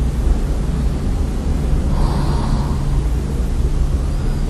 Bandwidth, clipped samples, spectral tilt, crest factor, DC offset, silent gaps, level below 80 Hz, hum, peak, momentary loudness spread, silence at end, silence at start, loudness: 12.5 kHz; under 0.1%; -7 dB/octave; 12 dB; under 0.1%; none; -18 dBFS; none; -4 dBFS; 2 LU; 0 s; 0 s; -20 LUFS